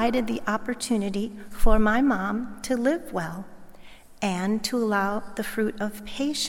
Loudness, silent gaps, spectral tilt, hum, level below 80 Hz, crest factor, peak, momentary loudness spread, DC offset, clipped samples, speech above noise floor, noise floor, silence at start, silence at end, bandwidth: -27 LUFS; none; -4.5 dB/octave; none; -34 dBFS; 20 dB; -6 dBFS; 9 LU; under 0.1%; under 0.1%; 21 dB; -45 dBFS; 0 s; 0 s; 16.5 kHz